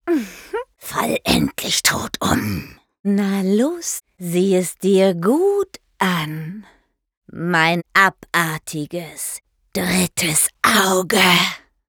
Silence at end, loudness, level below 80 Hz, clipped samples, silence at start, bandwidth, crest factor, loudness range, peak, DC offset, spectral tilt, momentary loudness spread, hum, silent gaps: 0.3 s; -18 LUFS; -48 dBFS; under 0.1%; 0.05 s; over 20 kHz; 18 dB; 3 LU; -2 dBFS; under 0.1%; -3.5 dB/octave; 14 LU; none; 2.99-3.04 s, 7.17-7.22 s